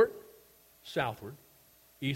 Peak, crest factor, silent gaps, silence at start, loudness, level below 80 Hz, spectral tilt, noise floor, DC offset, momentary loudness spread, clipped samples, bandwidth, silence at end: -14 dBFS; 22 dB; none; 0 s; -35 LUFS; -68 dBFS; -6 dB/octave; -62 dBFS; under 0.1%; 23 LU; under 0.1%; 16.5 kHz; 0 s